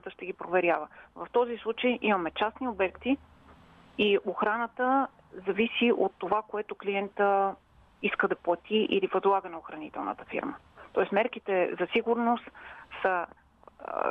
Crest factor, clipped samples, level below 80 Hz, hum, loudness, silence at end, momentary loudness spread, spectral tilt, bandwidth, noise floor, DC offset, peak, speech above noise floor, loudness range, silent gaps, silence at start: 16 dB; under 0.1%; -66 dBFS; none; -29 LUFS; 0 s; 14 LU; -7.5 dB/octave; 4.5 kHz; -55 dBFS; under 0.1%; -14 dBFS; 26 dB; 2 LU; none; 0.05 s